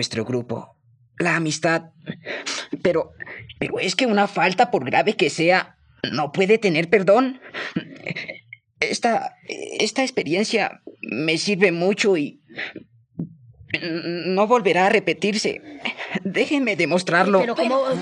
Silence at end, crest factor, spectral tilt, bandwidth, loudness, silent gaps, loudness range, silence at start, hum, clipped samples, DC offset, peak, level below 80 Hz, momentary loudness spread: 0 s; 20 dB; -4.5 dB/octave; 11 kHz; -21 LUFS; none; 4 LU; 0 s; none; under 0.1%; under 0.1%; -2 dBFS; -66 dBFS; 15 LU